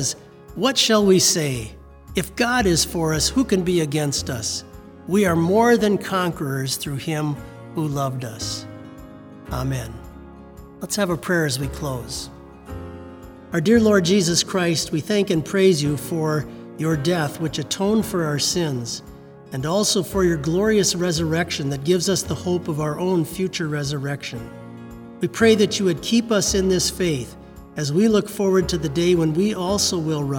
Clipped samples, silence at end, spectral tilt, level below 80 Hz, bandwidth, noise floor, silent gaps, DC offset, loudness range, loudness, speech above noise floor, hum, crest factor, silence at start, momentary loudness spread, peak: under 0.1%; 0 s; -4.5 dB/octave; -44 dBFS; over 20 kHz; -41 dBFS; none; under 0.1%; 7 LU; -21 LUFS; 21 dB; none; 18 dB; 0 s; 18 LU; -2 dBFS